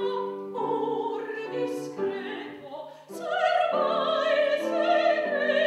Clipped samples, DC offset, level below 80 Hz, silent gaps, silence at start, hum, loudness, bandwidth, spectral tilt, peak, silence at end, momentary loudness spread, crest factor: under 0.1%; under 0.1%; -86 dBFS; none; 0 s; none; -27 LUFS; 13 kHz; -4.5 dB/octave; -12 dBFS; 0 s; 14 LU; 16 dB